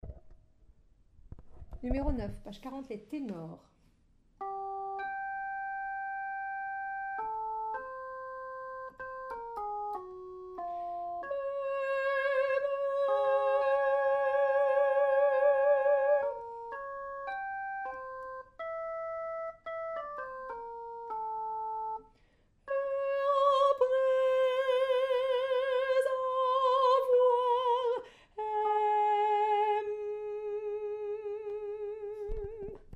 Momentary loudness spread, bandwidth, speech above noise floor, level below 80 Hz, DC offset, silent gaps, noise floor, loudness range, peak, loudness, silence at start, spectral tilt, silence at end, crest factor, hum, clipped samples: 15 LU; 10 kHz; 30 dB; -52 dBFS; under 0.1%; none; -67 dBFS; 12 LU; -16 dBFS; -32 LUFS; 0.05 s; -5.5 dB/octave; 0 s; 16 dB; none; under 0.1%